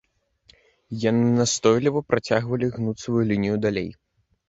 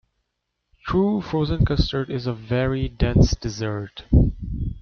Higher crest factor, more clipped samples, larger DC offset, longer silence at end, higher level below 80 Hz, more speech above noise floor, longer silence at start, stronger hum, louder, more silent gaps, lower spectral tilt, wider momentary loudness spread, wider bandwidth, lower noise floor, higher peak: about the same, 18 dB vs 18 dB; neither; neither; first, 0.55 s vs 0 s; second, -54 dBFS vs -28 dBFS; second, 38 dB vs 57 dB; about the same, 0.9 s vs 0.85 s; neither; about the same, -23 LUFS vs -23 LUFS; neither; second, -5.5 dB/octave vs -7 dB/octave; about the same, 9 LU vs 10 LU; first, 8.2 kHz vs 6.8 kHz; second, -60 dBFS vs -78 dBFS; about the same, -4 dBFS vs -4 dBFS